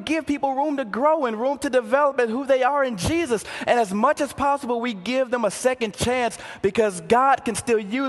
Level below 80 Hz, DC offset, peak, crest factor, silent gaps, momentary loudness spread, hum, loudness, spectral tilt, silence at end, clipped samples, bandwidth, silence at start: -48 dBFS; under 0.1%; -4 dBFS; 18 dB; none; 5 LU; none; -22 LUFS; -4.5 dB/octave; 0 s; under 0.1%; 12.5 kHz; 0 s